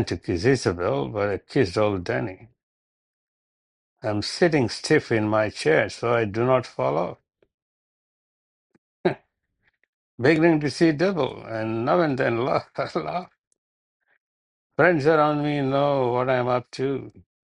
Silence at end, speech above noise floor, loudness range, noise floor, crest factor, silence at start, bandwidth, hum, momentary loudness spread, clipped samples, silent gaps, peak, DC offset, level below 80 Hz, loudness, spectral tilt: 0.25 s; 49 dB; 6 LU; -71 dBFS; 20 dB; 0 s; 11 kHz; none; 9 LU; under 0.1%; 2.63-3.96 s, 7.54-8.70 s, 8.78-9.04 s, 9.88-10.18 s, 13.38-13.51 s, 13.58-14.00 s, 14.20-14.70 s; -4 dBFS; under 0.1%; -60 dBFS; -23 LUFS; -6 dB/octave